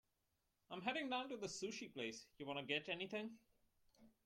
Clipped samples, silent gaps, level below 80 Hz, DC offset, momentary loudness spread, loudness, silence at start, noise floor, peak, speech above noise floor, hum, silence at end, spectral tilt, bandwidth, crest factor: under 0.1%; none; -84 dBFS; under 0.1%; 7 LU; -47 LUFS; 0.7 s; -86 dBFS; -26 dBFS; 39 dB; none; 0.15 s; -3 dB/octave; 16.5 kHz; 22 dB